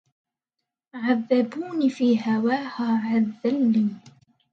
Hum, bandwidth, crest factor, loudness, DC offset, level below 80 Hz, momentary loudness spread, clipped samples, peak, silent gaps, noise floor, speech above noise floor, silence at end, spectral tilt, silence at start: none; 7.4 kHz; 16 dB; -23 LUFS; under 0.1%; -74 dBFS; 6 LU; under 0.1%; -8 dBFS; none; -85 dBFS; 62 dB; 0.45 s; -7.5 dB/octave; 0.95 s